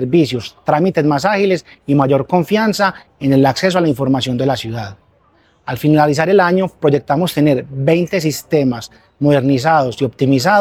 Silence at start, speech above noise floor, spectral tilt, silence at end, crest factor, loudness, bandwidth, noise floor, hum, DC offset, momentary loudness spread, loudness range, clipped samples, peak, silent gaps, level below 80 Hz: 0 s; 40 dB; -6.5 dB/octave; 0 s; 14 dB; -15 LUFS; 16.5 kHz; -54 dBFS; none; under 0.1%; 8 LU; 1 LU; under 0.1%; 0 dBFS; none; -50 dBFS